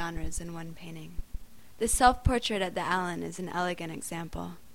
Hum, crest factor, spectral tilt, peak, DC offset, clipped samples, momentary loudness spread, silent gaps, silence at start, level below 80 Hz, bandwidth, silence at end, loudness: none; 24 dB; -4 dB/octave; -8 dBFS; 0.4%; under 0.1%; 21 LU; none; 0 s; -40 dBFS; 16.5 kHz; 0.2 s; -30 LUFS